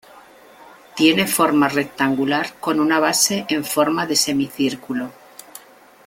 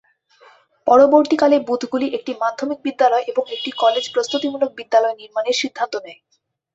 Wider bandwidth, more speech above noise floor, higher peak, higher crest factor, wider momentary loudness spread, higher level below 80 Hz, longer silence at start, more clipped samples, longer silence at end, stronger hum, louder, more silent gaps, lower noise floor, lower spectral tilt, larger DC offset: first, 17 kHz vs 8 kHz; second, 28 dB vs 34 dB; about the same, -2 dBFS vs -2 dBFS; about the same, 18 dB vs 18 dB; about the same, 12 LU vs 11 LU; first, -60 dBFS vs -66 dBFS; second, 0.15 s vs 0.85 s; neither; about the same, 0.5 s vs 0.6 s; neither; about the same, -18 LUFS vs -18 LUFS; neither; second, -47 dBFS vs -52 dBFS; about the same, -3 dB/octave vs -3 dB/octave; neither